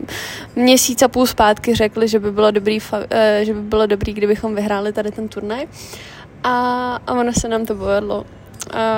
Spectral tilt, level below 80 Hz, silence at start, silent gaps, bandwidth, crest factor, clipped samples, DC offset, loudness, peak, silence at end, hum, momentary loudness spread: -4 dB/octave; -40 dBFS; 0 s; none; 17 kHz; 16 dB; under 0.1%; under 0.1%; -17 LUFS; 0 dBFS; 0 s; none; 13 LU